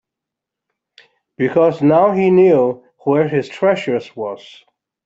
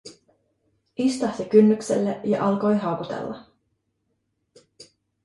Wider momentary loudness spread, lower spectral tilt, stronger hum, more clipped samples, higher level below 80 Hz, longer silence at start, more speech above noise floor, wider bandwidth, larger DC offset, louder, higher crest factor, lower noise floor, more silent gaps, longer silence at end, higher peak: about the same, 14 LU vs 16 LU; first, -8 dB/octave vs -6.5 dB/octave; neither; neither; about the same, -62 dBFS vs -64 dBFS; first, 1.4 s vs 0.05 s; first, 69 dB vs 53 dB; second, 7.8 kHz vs 11.5 kHz; neither; first, -15 LUFS vs -22 LUFS; second, 14 dB vs 20 dB; first, -83 dBFS vs -74 dBFS; neither; first, 0.7 s vs 0.4 s; about the same, -2 dBFS vs -4 dBFS